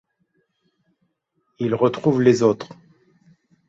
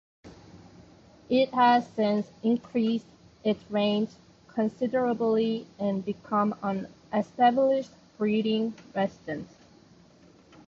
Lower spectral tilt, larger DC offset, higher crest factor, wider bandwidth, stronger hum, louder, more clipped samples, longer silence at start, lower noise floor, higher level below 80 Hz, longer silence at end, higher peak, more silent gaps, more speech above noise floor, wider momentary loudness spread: about the same, -7 dB/octave vs -7 dB/octave; neither; about the same, 20 dB vs 18 dB; first, 8 kHz vs 7.2 kHz; neither; first, -19 LUFS vs -27 LUFS; neither; first, 1.6 s vs 0.25 s; first, -72 dBFS vs -56 dBFS; about the same, -62 dBFS vs -66 dBFS; second, 0.95 s vs 1.25 s; first, -2 dBFS vs -10 dBFS; neither; first, 53 dB vs 30 dB; about the same, 13 LU vs 11 LU